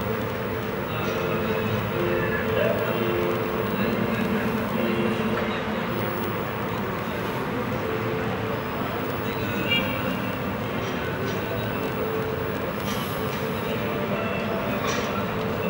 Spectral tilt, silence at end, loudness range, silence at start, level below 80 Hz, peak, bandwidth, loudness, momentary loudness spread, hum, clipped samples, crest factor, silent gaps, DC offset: -6 dB/octave; 0 s; 3 LU; 0 s; -48 dBFS; -10 dBFS; 16.5 kHz; -26 LUFS; 4 LU; none; under 0.1%; 16 dB; none; under 0.1%